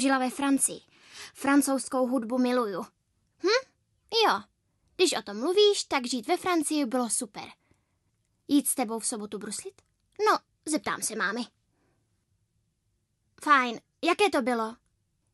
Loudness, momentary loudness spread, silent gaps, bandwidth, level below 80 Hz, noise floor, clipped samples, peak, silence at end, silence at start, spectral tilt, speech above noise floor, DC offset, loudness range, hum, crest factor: -27 LUFS; 14 LU; none; 13 kHz; -74 dBFS; -75 dBFS; under 0.1%; -8 dBFS; 0.6 s; 0 s; -2 dB/octave; 49 dB; under 0.1%; 5 LU; none; 20 dB